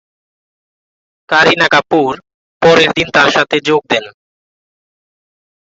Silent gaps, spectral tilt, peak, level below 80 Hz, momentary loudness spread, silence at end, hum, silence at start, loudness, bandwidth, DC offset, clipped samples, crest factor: 2.34-2.60 s; -4 dB/octave; 0 dBFS; -50 dBFS; 8 LU; 1.65 s; none; 1.3 s; -11 LUFS; 8 kHz; under 0.1%; under 0.1%; 14 dB